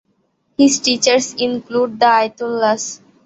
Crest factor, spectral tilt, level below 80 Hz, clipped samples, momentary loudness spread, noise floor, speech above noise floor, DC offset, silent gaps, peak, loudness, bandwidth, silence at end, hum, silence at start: 16 dB; -2 dB/octave; -60 dBFS; under 0.1%; 8 LU; -64 dBFS; 48 dB; under 0.1%; none; 0 dBFS; -15 LUFS; 8.4 kHz; 0.3 s; none; 0.6 s